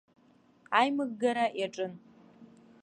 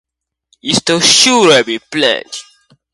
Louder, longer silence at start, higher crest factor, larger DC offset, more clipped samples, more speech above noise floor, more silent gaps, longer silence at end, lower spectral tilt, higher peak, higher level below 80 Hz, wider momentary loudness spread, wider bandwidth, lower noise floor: second, -30 LUFS vs -10 LUFS; about the same, 0.7 s vs 0.65 s; first, 24 dB vs 14 dB; neither; neither; second, 34 dB vs 47 dB; neither; second, 0.4 s vs 0.55 s; first, -4.5 dB/octave vs -2 dB/octave; second, -10 dBFS vs 0 dBFS; second, -84 dBFS vs -54 dBFS; second, 10 LU vs 18 LU; second, 10 kHz vs 16 kHz; first, -64 dBFS vs -58 dBFS